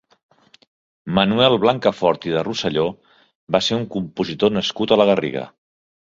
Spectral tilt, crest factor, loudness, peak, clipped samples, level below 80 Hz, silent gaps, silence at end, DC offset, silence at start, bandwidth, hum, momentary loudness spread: -5.5 dB/octave; 18 dB; -19 LUFS; -2 dBFS; under 0.1%; -54 dBFS; 3.35-3.47 s; 0.65 s; under 0.1%; 1.05 s; 7.6 kHz; none; 11 LU